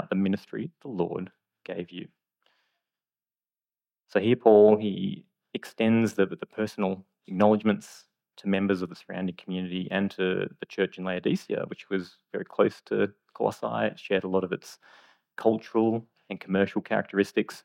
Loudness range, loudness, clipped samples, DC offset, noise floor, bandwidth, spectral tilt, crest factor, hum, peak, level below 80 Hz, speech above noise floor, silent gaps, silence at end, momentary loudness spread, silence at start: 8 LU; -27 LUFS; under 0.1%; under 0.1%; under -90 dBFS; 15.5 kHz; -7 dB/octave; 22 dB; none; -6 dBFS; -76 dBFS; over 63 dB; none; 0.05 s; 15 LU; 0 s